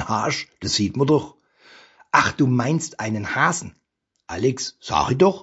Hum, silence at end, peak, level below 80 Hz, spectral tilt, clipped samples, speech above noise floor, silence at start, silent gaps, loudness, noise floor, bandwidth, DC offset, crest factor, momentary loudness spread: none; 0 s; 0 dBFS; -50 dBFS; -4.5 dB/octave; under 0.1%; 30 dB; 0 s; none; -21 LUFS; -51 dBFS; 8 kHz; under 0.1%; 22 dB; 10 LU